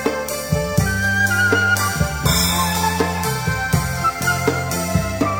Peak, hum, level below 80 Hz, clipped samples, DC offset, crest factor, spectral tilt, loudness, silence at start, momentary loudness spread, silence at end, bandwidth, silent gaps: -2 dBFS; none; -32 dBFS; under 0.1%; under 0.1%; 16 dB; -4 dB/octave; -18 LUFS; 0 s; 6 LU; 0 s; 17 kHz; none